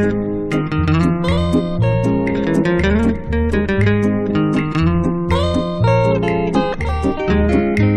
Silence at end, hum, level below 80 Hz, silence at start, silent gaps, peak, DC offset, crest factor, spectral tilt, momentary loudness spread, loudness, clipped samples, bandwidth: 0 s; none; -26 dBFS; 0 s; none; -2 dBFS; under 0.1%; 14 dB; -8 dB/octave; 4 LU; -17 LUFS; under 0.1%; 11 kHz